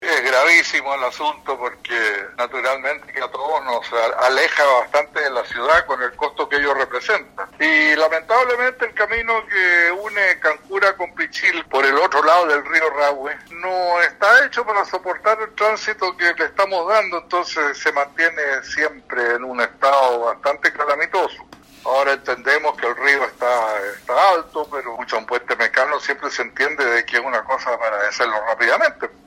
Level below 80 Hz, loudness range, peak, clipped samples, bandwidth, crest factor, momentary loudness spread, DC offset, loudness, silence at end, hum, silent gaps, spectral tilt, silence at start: -56 dBFS; 3 LU; 0 dBFS; under 0.1%; 16.5 kHz; 18 dB; 9 LU; under 0.1%; -18 LUFS; 0.2 s; none; none; -1.5 dB/octave; 0 s